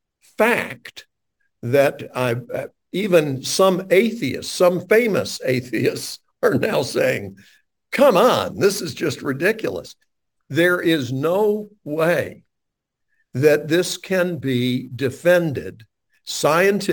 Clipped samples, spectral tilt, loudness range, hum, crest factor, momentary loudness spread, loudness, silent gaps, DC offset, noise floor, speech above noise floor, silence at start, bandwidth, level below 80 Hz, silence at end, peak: under 0.1%; -5 dB/octave; 3 LU; none; 18 dB; 13 LU; -19 LUFS; none; under 0.1%; -80 dBFS; 61 dB; 0.4 s; 19 kHz; -62 dBFS; 0 s; -2 dBFS